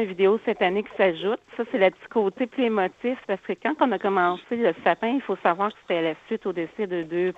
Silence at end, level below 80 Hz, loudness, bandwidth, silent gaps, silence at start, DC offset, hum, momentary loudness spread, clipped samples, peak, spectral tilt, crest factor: 0.05 s; -68 dBFS; -25 LUFS; 7.4 kHz; none; 0 s; under 0.1%; none; 7 LU; under 0.1%; -4 dBFS; -7 dB/octave; 20 dB